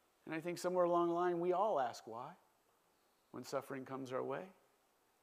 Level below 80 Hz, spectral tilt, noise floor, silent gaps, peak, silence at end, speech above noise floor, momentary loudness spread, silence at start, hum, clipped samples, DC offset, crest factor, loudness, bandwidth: under -90 dBFS; -6 dB/octave; -76 dBFS; none; -22 dBFS; 0.7 s; 37 dB; 17 LU; 0.25 s; none; under 0.1%; under 0.1%; 18 dB; -39 LUFS; 15 kHz